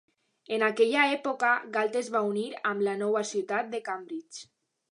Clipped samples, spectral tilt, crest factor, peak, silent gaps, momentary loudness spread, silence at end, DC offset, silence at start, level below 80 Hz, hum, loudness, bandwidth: under 0.1%; -3.5 dB/octave; 20 dB; -10 dBFS; none; 13 LU; 0.5 s; under 0.1%; 0.5 s; -86 dBFS; none; -28 LUFS; 11 kHz